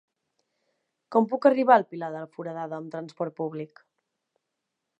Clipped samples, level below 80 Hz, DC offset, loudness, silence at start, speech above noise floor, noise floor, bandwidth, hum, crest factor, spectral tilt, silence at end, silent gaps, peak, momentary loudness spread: under 0.1%; -88 dBFS; under 0.1%; -26 LUFS; 1.1 s; 58 dB; -83 dBFS; 8 kHz; none; 24 dB; -8 dB/octave; 1.35 s; none; -4 dBFS; 16 LU